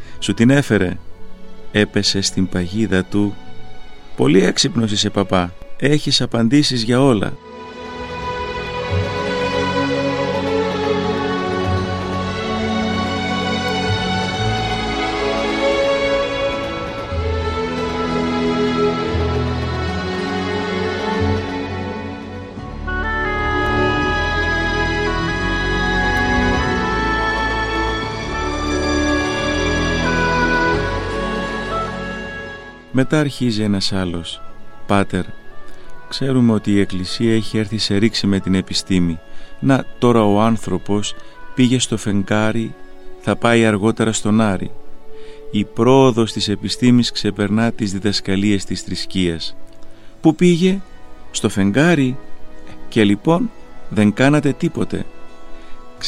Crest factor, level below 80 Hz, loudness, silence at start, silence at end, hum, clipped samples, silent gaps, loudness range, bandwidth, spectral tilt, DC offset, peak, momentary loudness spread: 18 dB; -34 dBFS; -18 LUFS; 0 s; 0 s; none; under 0.1%; none; 4 LU; 12.5 kHz; -5 dB/octave; under 0.1%; 0 dBFS; 11 LU